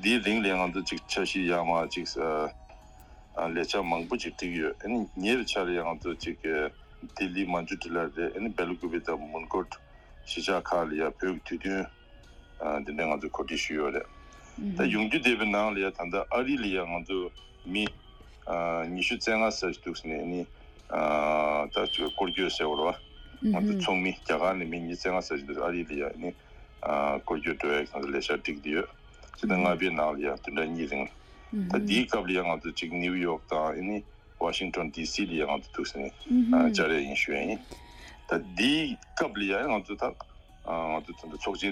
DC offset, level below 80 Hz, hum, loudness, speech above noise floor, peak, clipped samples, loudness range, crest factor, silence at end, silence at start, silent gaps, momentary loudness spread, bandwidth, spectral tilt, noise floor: under 0.1%; -52 dBFS; none; -30 LUFS; 22 dB; -12 dBFS; under 0.1%; 4 LU; 20 dB; 0 s; 0 s; none; 10 LU; 13 kHz; -4.5 dB/octave; -52 dBFS